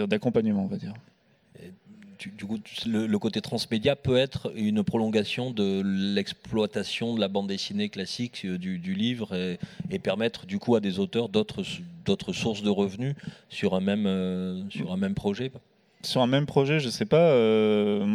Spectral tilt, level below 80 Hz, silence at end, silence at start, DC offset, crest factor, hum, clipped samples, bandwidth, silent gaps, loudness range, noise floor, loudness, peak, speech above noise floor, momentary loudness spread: -6 dB/octave; -60 dBFS; 0 s; 0 s; under 0.1%; 20 dB; none; under 0.1%; 13.5 kHz; none; 4 LU; -55 dBFS; -27 LUFS; -8 dBFS; 29 dB; 11 LU